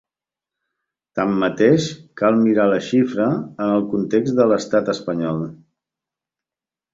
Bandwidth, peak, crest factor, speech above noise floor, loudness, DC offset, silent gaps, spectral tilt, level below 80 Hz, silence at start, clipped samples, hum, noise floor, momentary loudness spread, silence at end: 7.8 kHz; -2 dBFS; 18 dB; 72 dB; -19 LUFS; under 0.1%; none; -6.5 dB/octave; -60 dBFS; 1.15 s; under 0.1%; none; -90 dBFS; 8 LU; 1.4 s